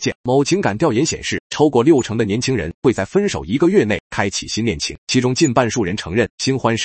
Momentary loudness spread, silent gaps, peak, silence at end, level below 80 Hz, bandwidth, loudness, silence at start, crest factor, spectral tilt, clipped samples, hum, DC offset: 6 LU; 0.15-0.24 s, 1.40-1.50 s, 2.74-2.82 s, 4.00-4.10 s, 4.98-5.07 s, 6.30-6.38 s; 0 dBFS; 0 s; -46 dBFS; 8.8 kHz; -17 LUFS; 0 s; 16 dB; -5 dB/octave; under 0.1%; none; under 0.1%